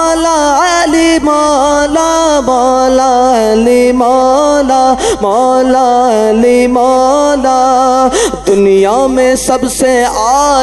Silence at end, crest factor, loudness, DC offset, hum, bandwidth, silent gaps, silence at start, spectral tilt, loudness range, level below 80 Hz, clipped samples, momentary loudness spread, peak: 0 s; 8 dB; -8 LUFS; under 0.1%; none; 12.5 kHz; none; 0 s; -3.5 dB/octave; 1 LU; -34 dBFS; 0.2%; 2 LU; 0 dBFS